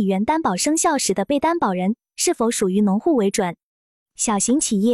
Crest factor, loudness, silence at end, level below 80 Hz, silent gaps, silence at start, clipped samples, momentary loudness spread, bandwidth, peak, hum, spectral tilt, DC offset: 12 dB; -20 LUFS; 0 s; -56 dBFS; 3.63-4.06 s; 0 s; under 0.1%; 5 LU; 13.5 kHz; -6 dBFS; none; -4 dB/octave; under 0.1%